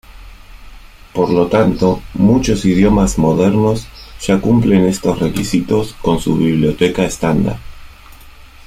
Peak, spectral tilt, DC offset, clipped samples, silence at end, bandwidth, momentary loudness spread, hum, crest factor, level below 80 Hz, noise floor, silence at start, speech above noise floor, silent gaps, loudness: -2 dBFS; -6.5 dB/octave; under 0.1%; under 0.1%; 0.35 s; 15.5 kHz; 6 LU; none; 14 dB; -32 dBFS; -38 dBFS; 0.15 s; 25 dB; none; -14 LUFS